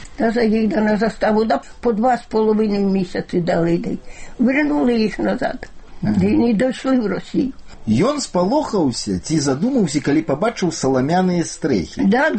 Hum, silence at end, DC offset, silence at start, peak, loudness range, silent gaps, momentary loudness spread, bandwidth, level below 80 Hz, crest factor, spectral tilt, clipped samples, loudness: none; 0 s; under 0.1%; 0 s; -6 dBFS; 1 LU; none; 6 LU; 8.8 kHz; -40 dBFS; 12 dB; -6 dB/octave; under 0.1%; -18 LUFS